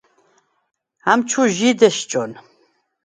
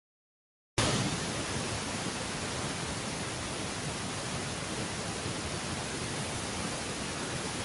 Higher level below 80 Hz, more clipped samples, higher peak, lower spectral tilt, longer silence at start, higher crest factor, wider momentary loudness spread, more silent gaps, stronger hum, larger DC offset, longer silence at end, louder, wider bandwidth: second, -68 dBFS vs -50 dBFS; neither; first, 0 dBFS vs -14 dBFS; about the same, -3.5 dB/octave vs -3.5 dB/octave; first, 1.05 s vs 0.75 s; about the same, 20 dB vs 22 dB; first, 10 LU vs 4 LU; neither; neither; neither; first, 0.65 s vs 0 s; first, -17 LUFS vs -34 LUFS; second, 9.6 kHz vs 12 kHz